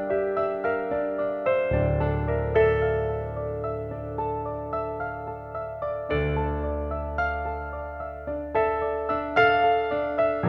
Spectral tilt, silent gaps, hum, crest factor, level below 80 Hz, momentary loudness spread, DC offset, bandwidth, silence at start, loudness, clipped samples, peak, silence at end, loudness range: -8.5 dB/octave; none; none; 18 dB; -38 dBFS; 11 LU; under 0.1%; 6 kHz; 0 s; -26 LUFS; under 0.1%; -8 dBFS; 0 s; 5 LU